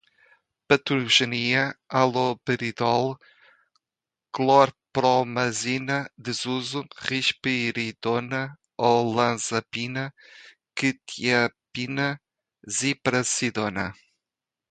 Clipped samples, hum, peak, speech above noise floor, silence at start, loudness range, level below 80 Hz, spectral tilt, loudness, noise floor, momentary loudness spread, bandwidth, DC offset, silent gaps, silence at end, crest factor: under 0.1%; none; -2 dBFS; 65 dB; 0.7 s; 4 LU; -64 dBFS; -3.5 dB/octave; -24 LUFS; -89 dBFS; 11 LU; 9.4 kHz; under 0.1%; none; 0.8 s; 22 dB